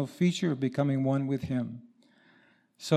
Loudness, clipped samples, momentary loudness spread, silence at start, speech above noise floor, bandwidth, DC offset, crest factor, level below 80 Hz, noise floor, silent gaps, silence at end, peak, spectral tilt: -30 LUFS; under 0.1%; 13 LU; 0 s; 35 dB; 13 kHz; under 0.1%; 20 dB; -68 dBFS; -64 dBFS; none; 0 s; -10 dBFS; -7 dB/octave